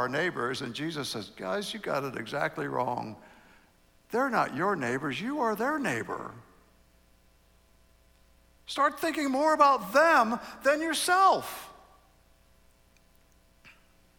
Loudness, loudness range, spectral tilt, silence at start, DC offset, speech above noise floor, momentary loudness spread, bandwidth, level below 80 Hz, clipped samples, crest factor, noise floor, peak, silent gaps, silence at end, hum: -28 LUFS; 10 LU; -4 dB/octave; 0 s; under 0.1%; 35 dB; 15 LU; 19.5 kHz; -66 dBFS; under 0.1%; 20 dB; -63 dBFS; -10 dBFS; none; 0.5 s; none